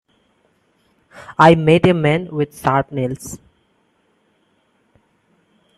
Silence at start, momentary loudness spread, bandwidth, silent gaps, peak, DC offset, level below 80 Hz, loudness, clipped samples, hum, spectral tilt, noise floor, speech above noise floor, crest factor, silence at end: 1.15 s; 19 LU; 13 kHz; none; 0 dBFS; under 0.1%; -50 dBFS; -16 LUFS; under 0.1%; none; -6.5 dB/octave; -62 dBFS; 47 dB; 20 dB; 2.4 s